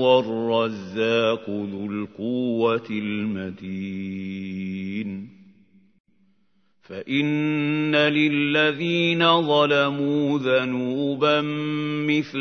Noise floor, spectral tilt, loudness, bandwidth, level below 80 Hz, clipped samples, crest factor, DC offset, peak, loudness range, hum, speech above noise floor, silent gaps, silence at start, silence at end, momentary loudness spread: -69 dBFS; -6.5 dB/octave; -23 LUFS; 6.6 kHz; -70 dBFS; under 0.1%; 18 dB; under 0.1%; -4 dBFS; 12 LU; none; 46 dB; 6.00-6.04 s; 0 s; 0 s; 12 LU